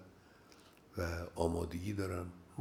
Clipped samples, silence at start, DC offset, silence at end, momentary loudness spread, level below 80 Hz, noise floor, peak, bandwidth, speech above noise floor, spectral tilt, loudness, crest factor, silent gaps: under 0.1%; 0 s; under 0.1%; 0 s; 24 LU; -58 dBFS; -62 dBFS; -18 dBFS; 16.5 kHz; 23 dB; -6.5 dB/octave; -40 LUFS; 24 dB; none